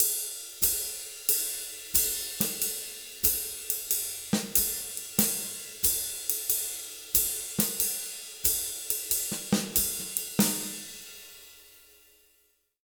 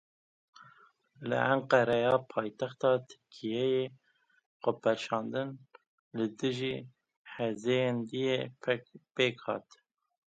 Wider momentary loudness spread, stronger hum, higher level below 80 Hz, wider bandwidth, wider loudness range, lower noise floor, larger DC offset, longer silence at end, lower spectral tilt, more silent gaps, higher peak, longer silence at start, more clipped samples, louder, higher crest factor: second, 10 LU vs 14 LU; neither; first, -54 dBFS vs -76 dBFS; first, over 20 kHz vs 9 kHz; second, 2 LU vs 5 LU; first, -69 dBFS vs -63 dBFS; neither; first, 1.05 s vs 0.75 s; second, -2 dB/octave vs -6 dB/octave; second, none vs 4.46-4.60 s, 5.87-6.11 s, 7.16-7.25 s; first, 0 dBFS vs -10 dBFS; second, 0 s vs 0.6 s; neither; first, -27 LUFS vs -32 LUFS; first, 30 dB vs 24 dB